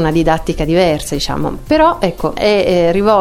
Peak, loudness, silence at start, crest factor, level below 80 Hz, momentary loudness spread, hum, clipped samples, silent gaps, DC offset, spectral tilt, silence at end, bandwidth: 0 dBFS; -14 LUFS; 0 s; 12 dB; -28 dBFS; 6 LU; none; under 0.1%; none; under 0.1%; -5.5 dB/octave; 0 s; 16.5 kHz